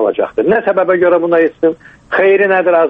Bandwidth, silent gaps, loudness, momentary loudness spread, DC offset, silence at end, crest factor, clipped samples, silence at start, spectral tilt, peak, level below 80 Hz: 5 kHz; none; -12 LUFS; 6 LU; under 0.1%; 0 s; 10 dB; under 0.1%; 0 s; -8 dB/octave; -2 dBFS; -54 dBFS